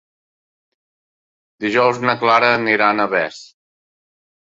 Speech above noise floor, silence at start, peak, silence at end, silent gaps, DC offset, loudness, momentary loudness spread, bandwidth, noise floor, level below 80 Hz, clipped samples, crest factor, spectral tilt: over 74 dB; 1.6 s; -2 dBFS; 0.95 s; none; under 0.1%; -16 LUFS; 7 LU; 7.8 kHz; under -90 dBFS; -64 dBFS; under 0.1%; 18 dB; -5 dB/octave